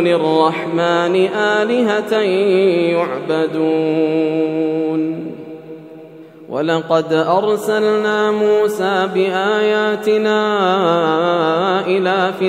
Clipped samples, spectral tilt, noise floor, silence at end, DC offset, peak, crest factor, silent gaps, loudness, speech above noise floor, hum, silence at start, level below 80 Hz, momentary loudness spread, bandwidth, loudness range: under 0.1%; -6 dB/octave; -37 dBFS; 0 s; under 0.1%; 0 dBFS; 16 dB; none; -16 LUFS; 22 dB; none; 0 s; -70 dBFS; 5 LU; 15 kHz; 4 LU